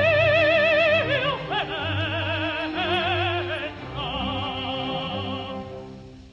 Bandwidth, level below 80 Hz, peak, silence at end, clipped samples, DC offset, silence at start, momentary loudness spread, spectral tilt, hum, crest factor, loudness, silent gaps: 7.8 kHz; -48 dBFS; -8 dBFS; 0 s; under 0.1%; under 0.1%; 0 s; 14 LU; -6 dB/octave; none; 16 dB; -23 LUFS; none